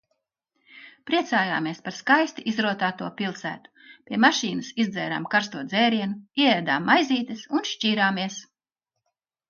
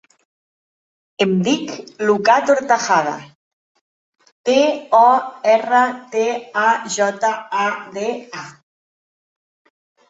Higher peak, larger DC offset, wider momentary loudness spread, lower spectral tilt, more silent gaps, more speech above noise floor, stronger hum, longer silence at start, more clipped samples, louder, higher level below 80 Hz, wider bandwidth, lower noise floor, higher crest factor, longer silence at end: about the same, -4 dBFS vs -2 dBFS; neither; about the same, 11 LU vs 11 LU; about the same, -4 dB/octave vs -4 dB/octave; second, none vs 3.35-3.75 s, 3.81-4.13 s, 4.32-4.44 s; second, 60 dB vs over 73 dB; neither; second, 0.75 s vs 1.2 s; neither; second, -24 LUFS vs -17 LUFS; second, -74 dBFS vs -68 dBFS; second, 7.2 kHz vs 8 kHz; second, -85 dBFS vs under -90 dBFS; about the same, 22 dB vs 18 dB; second, 1.05 s vs 1.6 s